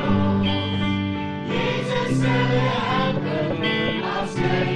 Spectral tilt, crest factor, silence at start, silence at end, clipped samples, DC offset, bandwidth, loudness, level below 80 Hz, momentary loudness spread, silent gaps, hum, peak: -6.5 dB/octave; 12 dB; 0 s; 0 s; under 0.1%; under 0.1%; 10.5 kHz; -22 LUFS; -42 dBFS; 5 LU; none; none; -10 dBFS